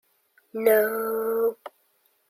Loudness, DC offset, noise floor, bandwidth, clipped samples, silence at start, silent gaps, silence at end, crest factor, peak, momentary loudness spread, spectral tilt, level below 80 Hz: -24 LUFS; under 0.1%; -67 dBFS; 16 kHz; under 0.1%; 0.55 s; none; 0.6 s; 18 dB; -8 dBFS; 15 LU; -4 dB/octave; -80 dBFS